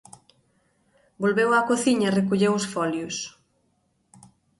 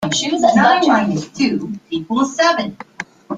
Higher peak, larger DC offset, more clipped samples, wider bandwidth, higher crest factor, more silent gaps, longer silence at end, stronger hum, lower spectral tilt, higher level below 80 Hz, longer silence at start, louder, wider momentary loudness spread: second, -8 dBFS vs 0 dBFS; neither; neither; first, 11.5 kHz vs 9.4 kHz; about the same, 18 dB vs 16 dB; neither; first, 1.3 s vs 0 s; neither; about the same, -5 dB/octave vs -4 dB/octave; second, -66 dBFS vs -56 dBFS; first, 1.2 s vs 0 s; second, -23 LUFS vs -16 LUFS; second, 10 LU vs 16 LU